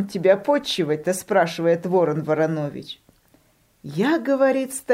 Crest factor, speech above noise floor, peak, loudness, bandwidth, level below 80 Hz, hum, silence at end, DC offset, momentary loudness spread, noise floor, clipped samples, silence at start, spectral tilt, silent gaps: 18 dB; 38 dB; -4 dBFS; -21 LUFS; 16 kHz; -64 dBFS; none; 0 s; under 0.1%; 13 LU; -59 dBFS; under 0.1%; 0 s; -5 dB/octave; none